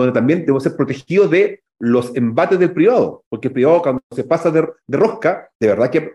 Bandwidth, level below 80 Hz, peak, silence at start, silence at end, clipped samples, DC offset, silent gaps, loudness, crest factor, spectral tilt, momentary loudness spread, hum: 11.5 kHz; -60 dBFS; -4 dBFS; 0 s; 0 s; under 0.1%; under 0.1%; 3.26-3.31 s, 4.03-4.10 s, 5.55-5.60 s; -16 LUFS; 12 dB; -8 dB/octave; 8 LU; none